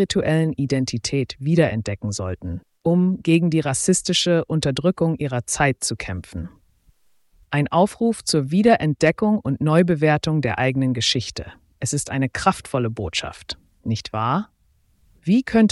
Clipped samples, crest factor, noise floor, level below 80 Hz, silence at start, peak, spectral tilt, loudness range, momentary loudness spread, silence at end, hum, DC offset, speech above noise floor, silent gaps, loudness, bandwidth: under 0.1%; 18 dB; -61 dBFS; -48 dBFS; 0 s; -2 dBFS; -5 dB/octave; 5 LU; 13 LU; 0 s; none; under 0.1%; 41 dB; none; -21 LUFS; 12 kHz